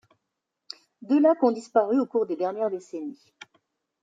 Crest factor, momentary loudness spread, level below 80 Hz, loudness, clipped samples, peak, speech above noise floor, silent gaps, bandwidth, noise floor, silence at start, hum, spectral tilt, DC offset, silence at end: 18 dB; 22 LU; -82 dBFS; -24 LUFS; under 0.1%; -8 dBFS; 59 dB; none; 7.8 kHz; -83 dBFS; 1 s; none; -6 dB/octave; under 0.1%; 0.9 s